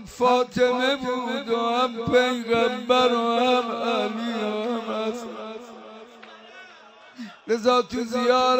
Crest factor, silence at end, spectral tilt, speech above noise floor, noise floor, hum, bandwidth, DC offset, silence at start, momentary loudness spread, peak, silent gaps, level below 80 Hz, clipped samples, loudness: 18 dB; 0 s; -4 dB/octave; 26 dB; -48 dBFS; none; 16 kHz; under 0.1%; 0 s; 20 LU; -6 dBFS; none; -60 dBFS; under 0.1%; -23 LUFS